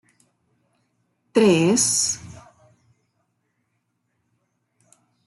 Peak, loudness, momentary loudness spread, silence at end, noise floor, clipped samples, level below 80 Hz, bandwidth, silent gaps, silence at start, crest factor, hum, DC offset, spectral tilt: -6 dBFS; -19 LUFS; 8 LU; 2.95 s; -73 dBFS; under 0.1%; -66 dBFS; 12.5 kHz; none; 1.35 s; 20 dB; none; under 0.1%; -3.5 dB/octave